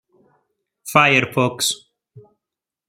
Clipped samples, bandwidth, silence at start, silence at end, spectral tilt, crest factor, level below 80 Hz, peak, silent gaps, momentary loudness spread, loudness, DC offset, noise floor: under 0.1%; 16 kHz; 0.85 s; 0.7 s; -3.5 dB/octave; 20 dB; -62 dBFS; -2 dBFS; none; 15 LU; -17 LUFS; under 0.1%; -86 dBFS